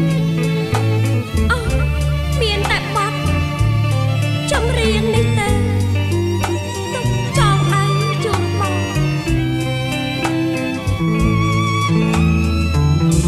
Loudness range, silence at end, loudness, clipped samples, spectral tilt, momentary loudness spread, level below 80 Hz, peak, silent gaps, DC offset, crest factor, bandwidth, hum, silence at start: 1 LU; 0 s; -17 LUFS; under 0.1%; -6 dB/octave; 4 LU; -26 dBFS; -2 dBFS; none; under 0.1%; 14 dB; 14.5 kHz; none; 0 s